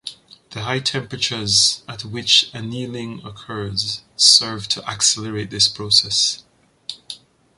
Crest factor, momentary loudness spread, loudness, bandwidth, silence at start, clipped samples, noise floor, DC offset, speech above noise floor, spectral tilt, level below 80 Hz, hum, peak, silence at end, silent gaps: 22 dB; 20 LU; -16 LUFS; 11.5 kHz; 0.05 s; under 0.1%; -40 dBFS; under 0.1%; 20 dB; -1.5 dB/octave; -54 dBFS; none; 0 dBFS; 0.4 s; none